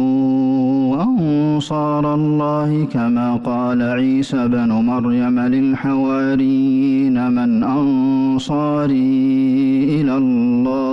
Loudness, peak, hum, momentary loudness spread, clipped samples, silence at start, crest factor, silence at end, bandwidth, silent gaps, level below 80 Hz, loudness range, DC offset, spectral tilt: -16 LUFS; -10 dBFS; none; 3 LU; under 0.1%; 0 s; 6 dB; 0 s; 8 kHz; none; -50 dBFS; 1 LU; under 0.1%; -8 dB/octave